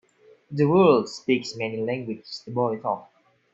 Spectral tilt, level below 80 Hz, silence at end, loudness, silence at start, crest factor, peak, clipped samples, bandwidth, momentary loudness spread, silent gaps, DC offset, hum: -6.5 dB/octave; -68 dBFS; 0.5 s; -24 LUFS; 0.5 s; 20 dB; -4 dBFS; under 0.1%; 8 kHz; 15 LU; none; under 0.1%; none